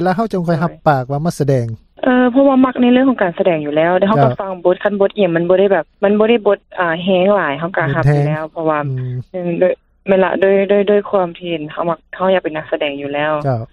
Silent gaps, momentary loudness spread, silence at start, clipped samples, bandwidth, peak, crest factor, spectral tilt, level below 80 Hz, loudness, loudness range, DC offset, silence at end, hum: none; 8 LU; 0 s; under 0.1%; 12.5 kHz; 0 dBFS; 14 dB; -8 dB/octave; -48 dBFS; -15 LUFS; 3 LU; under 0.1%; 0.1 s; none